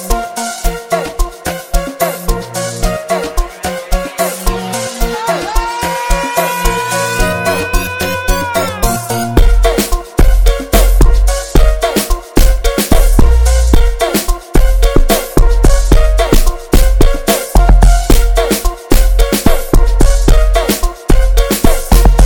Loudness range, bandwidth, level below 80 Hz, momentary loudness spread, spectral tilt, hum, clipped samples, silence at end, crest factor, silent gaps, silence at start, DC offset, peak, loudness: 5 LU; 18 kHz; -10 dBFS; 7 LU; -4.5 dB/octave; none; 0.3%; 0 s; 10 dB; none; 0 s; under 0.1%; 0 dBFS; -13 LUFS